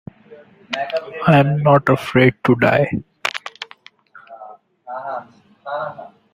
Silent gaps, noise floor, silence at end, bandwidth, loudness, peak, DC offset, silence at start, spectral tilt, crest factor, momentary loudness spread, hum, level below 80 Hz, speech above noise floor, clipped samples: none; -47 dBFS; 0.25 s; 15 kHz; -17 LUFS; 0 dBFS; under 0.1%; 0.3 s; -7 dB/octave; 18 dB; 21 LU; none; -54 dBFS; 32 dB; under 0.1%